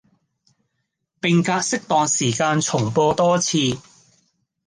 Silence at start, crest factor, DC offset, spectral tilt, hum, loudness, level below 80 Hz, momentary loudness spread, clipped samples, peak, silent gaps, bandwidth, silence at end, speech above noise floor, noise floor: 1.25 s; 16 dB; under 0.1%; -4 dB/octave; none; -19 LUFS; -58 dBFS; 4 LU; under 0.1%; -4 dBFS; none; 10 kHz; 0.85 s; 57 dB; -75 dBFS